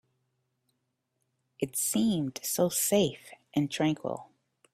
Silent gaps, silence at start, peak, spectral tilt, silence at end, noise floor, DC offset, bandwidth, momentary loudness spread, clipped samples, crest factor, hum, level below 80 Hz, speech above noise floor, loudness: none; 1.6 s; -12 dBFS; -4 dB/octave; 0.5 s; -80 dBFS; under 0.1%; 16 kHz; 12 LU; under 0.1%; 18 dB; none; -68 dBFS; 51 dB; -29 LUFS